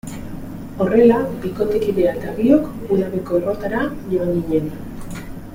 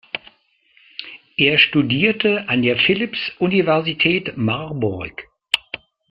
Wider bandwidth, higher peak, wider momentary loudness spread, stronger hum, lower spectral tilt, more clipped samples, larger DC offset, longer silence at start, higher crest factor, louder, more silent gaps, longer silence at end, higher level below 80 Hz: first, 16.5 kHz vs 14 kHz; about the same, -2 dBFS vs 0 dBFS; about the same, 18 LU vs 19 LU; neither; first, -8 dB/octave vs -6 dB/octave; neither; neither; about the same, 0.05 s vs 0.15 s; about the same, 16 dB vs 20 dB; about the same, -19 LUFS vs -18 LUFS; neither; second, 0 s vs 0.35 s; first, -40 dBFS vs -54 dBFS